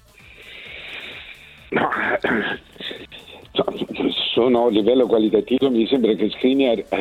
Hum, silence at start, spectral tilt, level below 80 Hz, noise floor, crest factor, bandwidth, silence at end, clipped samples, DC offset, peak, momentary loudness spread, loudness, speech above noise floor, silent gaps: none; 0.4 s; -6.5 dB/octave; -54 dBFS; -45 dBFS; 16 dB; 12.5 kHz; 0 s; under 0.1%; under 0.1%; -6 dBFS; 19 LU; -19 LUFS; 27 dB; none